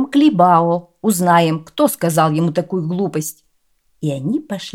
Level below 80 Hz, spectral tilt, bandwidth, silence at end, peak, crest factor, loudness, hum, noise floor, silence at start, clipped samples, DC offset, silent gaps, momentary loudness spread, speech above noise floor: -62 dBFS; -6 dB/octave; 16.5 kHz; 0.05 s; -2 dBFS; 16 dB; -16 LUFS; none; -64 dBFS; 0 s; under 0.1%; under 0.1%; none; 10 LU; 49 dB